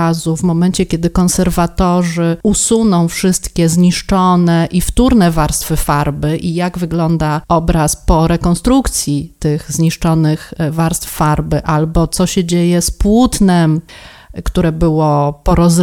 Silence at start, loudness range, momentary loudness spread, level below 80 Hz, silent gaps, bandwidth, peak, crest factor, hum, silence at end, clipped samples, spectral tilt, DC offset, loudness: 0 s; 2 LU; 6 LU; -24 dBFS; none; 17 kHz; 0 dBFS; 12 dB; none; 0 s; under 0.1%; -5.5 dB/octave; under 0.1%; -13 LUFS